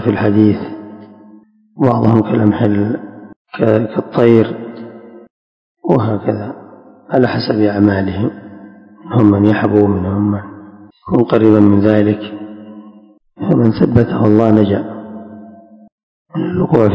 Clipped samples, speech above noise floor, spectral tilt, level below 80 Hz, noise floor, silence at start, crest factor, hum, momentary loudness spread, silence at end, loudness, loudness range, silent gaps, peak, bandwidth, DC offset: 0.7%; 32 dB; -10 dB/octave; -40 dBFS; -44 dBFS; 0 s; 14 dB; none; 21 LU; 0 s; -13 LUFS; 4 LU; 3.36-3.45 s, 5.30-5.75 s, 15.92-16.25 s; 0 dBFS; 5.4 kHz; under 0.1%